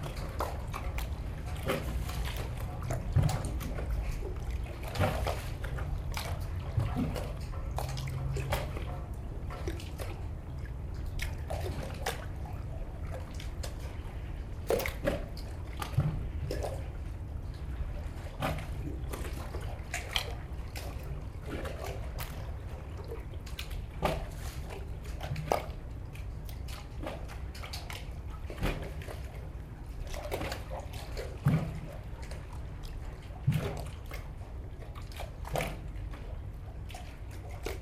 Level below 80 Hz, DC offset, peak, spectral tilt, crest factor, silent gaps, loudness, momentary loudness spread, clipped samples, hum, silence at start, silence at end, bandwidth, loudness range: -40 dBFS; under 0.1%; -10 dBFS; -5.5 dB/octave; 26 dB; none; -38 LUFS; 11 LU; under 0.1%; none; 0 s; 0 s; 15.5 kHz; 5 LU